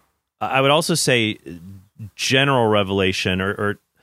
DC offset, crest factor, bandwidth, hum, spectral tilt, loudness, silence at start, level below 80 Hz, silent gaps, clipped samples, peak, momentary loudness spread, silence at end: under 0.1%; 18 dB; 16 kHz; none; -4 dB/octave; -18 LUFS; 0.4 s; -58 dBFS; none; under 0.1%; -2 dBFS; 16 LU; 0.25 s